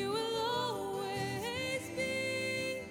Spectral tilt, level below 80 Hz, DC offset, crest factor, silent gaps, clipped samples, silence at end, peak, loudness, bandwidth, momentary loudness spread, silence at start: -3.5 dB/octave; -68 dBFS; under 0.1%; 14 dB; none; under 0.1%; 0 s; -22 dBFS; -35 LUFS; 19 kHz; 3 LU; 0 s